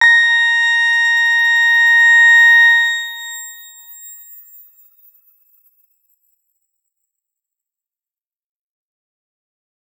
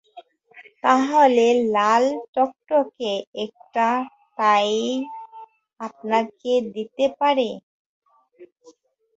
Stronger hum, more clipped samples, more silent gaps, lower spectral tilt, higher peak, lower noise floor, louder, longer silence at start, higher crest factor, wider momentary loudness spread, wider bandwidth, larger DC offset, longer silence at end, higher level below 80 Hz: neither; neither; second, none vs 2.28-2.33 s, 3.27-3.33 s, 7.63-8.02 s; second, 7 dB/octave vs -4 dB/octave; about the same, -2 dBFS vs -2 dBFS; first, under -90 dBFS vs -54 dBFS; first, -9 LUFS vs -21 LUFS; second, 0 s vs 0.15 s; second, 14 dB vs 20 dB; about the same, 19 LU vs 17 LU; first, 16.5 kHz vs 8 kHz; neither; first, 5.85 s vs 0.7 s; second, under -90 dBFS vs -70 dBFS